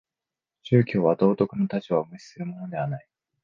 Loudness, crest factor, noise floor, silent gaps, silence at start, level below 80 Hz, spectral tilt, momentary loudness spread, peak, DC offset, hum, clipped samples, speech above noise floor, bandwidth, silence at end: -25 LUFS; 20 dB; -89 dBFS; none; 0.65 s; -64 dBFS; -9 dB/octave; 16 LU; -6 dBFS; under 0.1%; none; under 0.1%; 65 dB; 7.2 kHz; 0.45 s